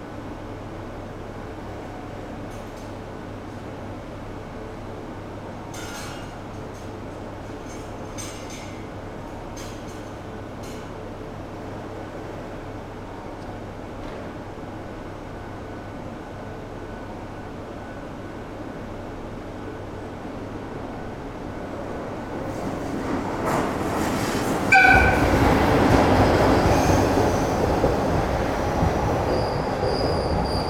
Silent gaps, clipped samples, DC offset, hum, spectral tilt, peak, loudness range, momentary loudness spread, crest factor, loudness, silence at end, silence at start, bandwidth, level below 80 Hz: none; under 0.1%; under 0.1%; none; -5.5 dB/octave; -2 dBFS; 17 LU; 17 LU; 24 dB; -25 LUFS; 0 s; 0 s; 17.5 kHz; -36 dBFS